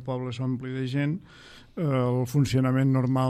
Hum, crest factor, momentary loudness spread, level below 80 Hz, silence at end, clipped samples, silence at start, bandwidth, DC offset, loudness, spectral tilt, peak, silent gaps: none; 14 dB; 8 LU; -56 dBFS; 0 s; under 0.1%; 0 s; 14 kHz; under 0.1%; -26 LUFS; -7.5 dB/octave; -12 dBFS; none